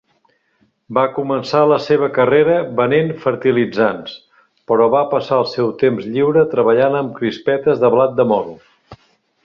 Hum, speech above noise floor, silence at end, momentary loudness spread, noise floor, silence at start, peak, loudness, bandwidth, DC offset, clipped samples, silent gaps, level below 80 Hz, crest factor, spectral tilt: none; 46 dB; 0.5 s; 6 LU; -61 dBFS; 0.9 s; -2 dBFS; -15 LUFS; 7 kHz; under 0.1%; under 0.1%; none; -58 dBFS; 14 dB; -7.5 dB/octave